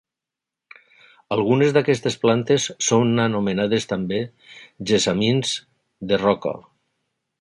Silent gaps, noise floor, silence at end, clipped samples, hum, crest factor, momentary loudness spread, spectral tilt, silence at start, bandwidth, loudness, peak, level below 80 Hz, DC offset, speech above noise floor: none; -87 dBFS; 0.8 s; under 0.1%; none; 18 dB; 11 LU; -4.5 dB/octave; 1.3 s; 11.5 kHz; -20 LUFS; -4 dBFS; -56 dBFS; under 0.1%; 67 dB